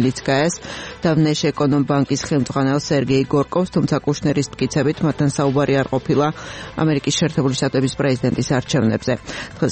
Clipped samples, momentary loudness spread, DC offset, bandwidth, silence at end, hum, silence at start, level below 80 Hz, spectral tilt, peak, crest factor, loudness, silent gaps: under 0.1%; 5 LU; under 0.1%; 8.8 kHz; 0 s; none; 0 s; -46 dBFS; -5.5 dB/octave; -6 dBFS; 12 dB; -19 LUFS; none